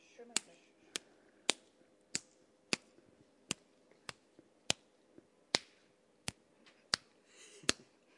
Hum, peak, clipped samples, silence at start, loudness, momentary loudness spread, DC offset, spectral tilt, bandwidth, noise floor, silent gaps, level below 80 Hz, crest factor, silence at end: none; -8 dBFS; under 0.1%; 0.2 s; -40 LUFS; 15 LU; under 0.1%; -1 dB/octave; 11.5 kHz; -71 dBFS; none; -78 dBFS; 36 dB; 0.45 s